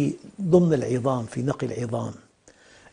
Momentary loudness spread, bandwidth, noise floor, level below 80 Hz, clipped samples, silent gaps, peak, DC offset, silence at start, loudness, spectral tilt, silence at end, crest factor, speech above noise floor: 12 LU; 10 kHz; -55 dBFS; -56 dBFS; under 0.1%; none; -6 dBFS; under 0.1%; 0 s; -24 LUFS; -8 dB/octave; 0.75 s; 20 dB; 32 dB